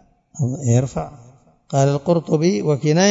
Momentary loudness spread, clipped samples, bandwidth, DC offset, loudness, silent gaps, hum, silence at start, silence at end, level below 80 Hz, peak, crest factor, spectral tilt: 9 LU; under 0.1%; 7.8 kHz; under 0.1%; -19 LUFS; none; none; 0.35 s; 0 s; -50 dBFS; -2 dBFS; 18 dB; -6 dB/octave